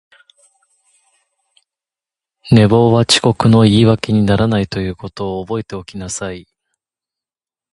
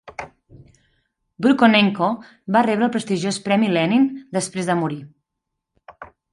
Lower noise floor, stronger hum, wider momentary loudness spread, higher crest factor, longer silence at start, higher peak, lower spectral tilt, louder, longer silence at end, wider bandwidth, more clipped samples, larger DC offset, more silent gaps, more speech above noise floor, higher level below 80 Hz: first, under -90 dBFS vs -80 dBFS; neither; about the same, 15 LU vs 16 LU; about the same, 16 dB vs 20 dB; first, 2.45 s vs 0.05 s; about the same, 0 dBFS vs -2 dBFS; about the same, -6 dB/octave vs -5 dB/octave; first, -14 LUFS vs -19 LUFS; first, 1.3 s vs 0.3 s; about the same, 11.5 kHz vs 11.5 kHz; neither; neither; neither; first, over 77 dB vs 62 dB; first, -40 dBFS vs -62 dBFS